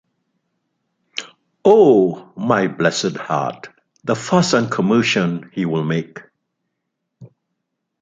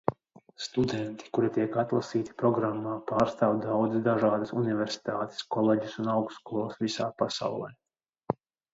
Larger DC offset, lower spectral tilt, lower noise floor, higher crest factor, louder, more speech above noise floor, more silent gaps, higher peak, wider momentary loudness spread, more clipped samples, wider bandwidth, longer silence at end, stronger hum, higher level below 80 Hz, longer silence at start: neither; about the same, -5.5 dB/octave vs -6.5 dB/octave; first, -76 dBFS vs -54 dBFS; about the same, 18 dB vs 22 dB; first, -17 LUFS vs -30 LUFS; first, 60 dB vs 25 dB; neither; first, 0 dBFS vs -6 dBFS; first, 18 LU vs 8 LU; neither; first, 9.4 kHz vs 8 kHz; first, 0.75 s vs 0.4 s; neither; about the same, -62 dBFS vs -64 dBFS; first, 1.15 s vs 0.05 s